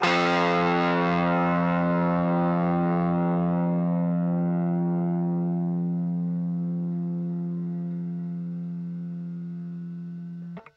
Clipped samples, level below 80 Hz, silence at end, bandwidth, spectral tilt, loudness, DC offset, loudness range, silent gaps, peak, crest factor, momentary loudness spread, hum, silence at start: under 0.1%; -62 dBFS; 0.15 s; 7 kHz; -8 dB/octave; -26 LUFS; under 0.1%; 9 LU; none; -8 dBFS; 16 dB; 12 LU; none; 0 s